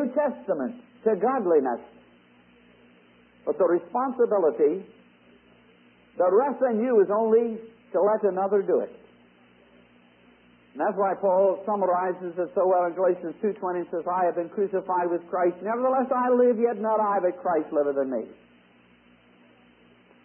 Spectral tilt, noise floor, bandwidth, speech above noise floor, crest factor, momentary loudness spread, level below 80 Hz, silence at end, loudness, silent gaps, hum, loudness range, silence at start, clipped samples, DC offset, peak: -11.5 dB/octave; -58 dBFS; 3.2 kHz; 34 dB; 16 dB; 8 LU; -76 dBFS; 1.9 s; -25 LUFS; none; 60 Hz at -60 dBFS; 4 LU; 0 s; under 0.1%; under 0.1%; -10 dBFS